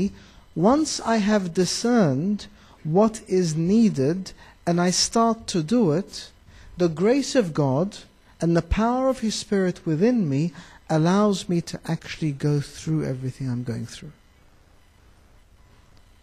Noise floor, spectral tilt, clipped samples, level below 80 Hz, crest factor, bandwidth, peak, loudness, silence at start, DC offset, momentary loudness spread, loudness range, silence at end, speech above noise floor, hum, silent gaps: -55 dBFS; -5.5 dB/octave; under 0.1%; -44 dBFS; 16 dB; 14 kHz; -8 dBFS; -23 LUFS; 0 s; under 0.1%; 11 LU; 7 LU; 2.1 s; 32 dB; none; none